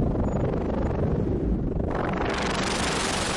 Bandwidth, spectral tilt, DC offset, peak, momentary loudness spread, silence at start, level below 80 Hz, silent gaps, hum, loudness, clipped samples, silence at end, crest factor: 11.5 kHz; -5 dB/octave; under 0.1%; -12 dBFS; 2 LU; 0 s; -32 dBFS; none; none; -26 LUFS; under 0.1%; 0 s; 12 dB